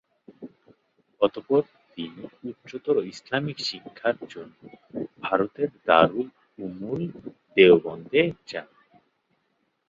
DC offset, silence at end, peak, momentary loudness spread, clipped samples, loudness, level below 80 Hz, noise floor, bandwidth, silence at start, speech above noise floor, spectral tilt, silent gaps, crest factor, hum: under 0.1%; 1.25 s; -2 dBFS; 20 LU; under 0.1%; -24 LUFS; -64 dBFS; -73 dBFS; 7.6 kHz; 0.4 s; 48 dB; -6 dB/octave; none; 24 dB; none